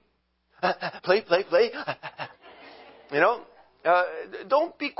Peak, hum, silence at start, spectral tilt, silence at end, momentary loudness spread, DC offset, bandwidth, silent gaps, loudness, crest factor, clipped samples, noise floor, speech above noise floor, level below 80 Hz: -6 dBFS; none; 0.6 s; -8 dB/octave; 0.1 s; 13 LU; under 0.1%; 5.8 kHz; none; -25 LUFS; 20 dB; under 0.1%; -71 dBFS; 46 dB; -74 dBFS